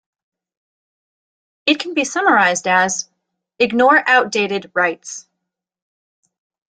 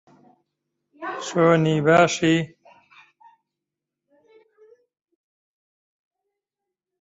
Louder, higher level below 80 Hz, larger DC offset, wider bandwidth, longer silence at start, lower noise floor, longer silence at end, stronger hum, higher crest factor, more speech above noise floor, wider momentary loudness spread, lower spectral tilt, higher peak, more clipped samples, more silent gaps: first, -16 LUFS vs -19 LUFS; about the same, -66 dBFS vs -64 dBFS; neither; first, 9.6 kHz vs 8 kHz; first, 1.65 s vs 1 s; second, -79 dBFS vs -86 dBFS; second, 1.6 s vs 4.55 s; neither; about the same, 18 dB vs 22 dB; second, 63 dB vs 67 dB; second, 14 LU vs 17 LU; second, -2.5 dB/octave vs -5.5 dB/octave; first, 0 dBFS vs -4 dBFS; neither; neither